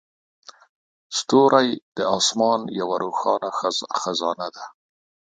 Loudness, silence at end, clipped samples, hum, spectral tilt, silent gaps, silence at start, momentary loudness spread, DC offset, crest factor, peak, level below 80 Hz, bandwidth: -21 LUFS; 0.7 s; under 0.1%; none; -3 dB/octave; 1.82-1.92 s; 1.1 s; 12 LU; under 0.1%; 22 dB; -2 dBFS; -70 dBFS; 9.6 kHz